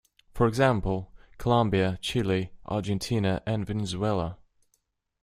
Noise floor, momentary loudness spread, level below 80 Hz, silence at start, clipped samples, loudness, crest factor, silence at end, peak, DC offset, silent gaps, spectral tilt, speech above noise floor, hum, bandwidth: -74 dBFS; 9 LU; -46 dBFS; 0.35 s; under 0.1%; -27 LUFS; 20 dB; 0.9 s; -6 dBFS; under 0.1%; none; -6.5 dB/octave; 48 dB; none; 15.5 kHz